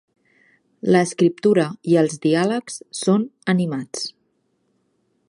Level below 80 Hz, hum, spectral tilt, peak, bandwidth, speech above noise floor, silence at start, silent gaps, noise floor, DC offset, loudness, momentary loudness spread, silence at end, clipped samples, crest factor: -70 dBFS; none; -5.5 dB/octave; -4 dBFS; 11.5 kHz; 49 dB; 0.85 s; none; -68 dBFS; under 0.1%; -20 LUFS; 11 LU; 1.2 s; under 0.1%; 18 dB